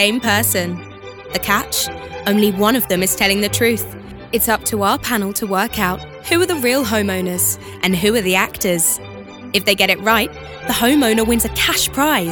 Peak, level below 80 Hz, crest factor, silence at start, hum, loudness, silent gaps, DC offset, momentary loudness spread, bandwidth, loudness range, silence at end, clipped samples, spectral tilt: 0 dBFS; -40 dBFS; 18 dB; 0 s; none; -16 LUFS; none; under 0.1%; 10 LU; over 20 kHz; 2 LU; 0 s; under 0.1%; -3 dB/octave